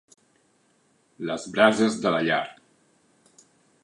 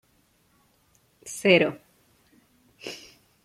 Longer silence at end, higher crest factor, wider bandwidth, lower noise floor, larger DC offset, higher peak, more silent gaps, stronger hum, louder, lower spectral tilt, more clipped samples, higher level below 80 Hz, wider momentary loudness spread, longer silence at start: first, 1.3 s vs 0.5 s; about the same, 24 dB vs 24 dB; second, 10.5 kHz vs 15.5 kHz; about the same, -65 dBFS vs -65 dBFS; neither; about the same, -4 dBFS vs -4 dBFS; neither; neither; about the same, -23 LUFS vs -22 LUFS; about the same, -4.5 dB/octave vs -4.5 dB/octave; neither; about the same, -70 dBFS vs -70 dBFS; second, 15 LU vs 25 LU; about the same, 1.2 s vs 1.25 s